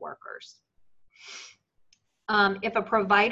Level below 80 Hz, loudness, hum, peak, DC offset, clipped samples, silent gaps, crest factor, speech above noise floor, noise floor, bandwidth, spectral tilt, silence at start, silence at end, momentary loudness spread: -66 dBFS; -24 LUFS; none; -6 dBFS; under 0.1%; under 0.1%; none; 22 dB; 39 dB; -66 dBFS; 7.8 kHz; -4.5 dB/octave; 0 s; 0 s; 21 LU